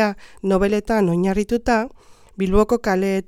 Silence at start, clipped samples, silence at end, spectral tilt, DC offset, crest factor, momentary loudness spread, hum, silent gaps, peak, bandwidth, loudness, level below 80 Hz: 0 s; under 0.1%; 0.05 s; -6.5 dB/octave; under 0.1%; 16 dB; 6 LU; none; none; -4 dBFS; 15 kHz; -20 LUFS; -34 dBFS